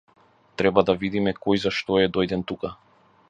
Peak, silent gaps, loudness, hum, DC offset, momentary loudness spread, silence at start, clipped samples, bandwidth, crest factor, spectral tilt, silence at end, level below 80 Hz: -2 dBFS; none; -23 LUFS; none; under 0.1%; 12 LU; 0.6 s; under 0.1%; 9 kHz; 22 dB; -6.5 dB/octave; 0.55 s; -52 dBFS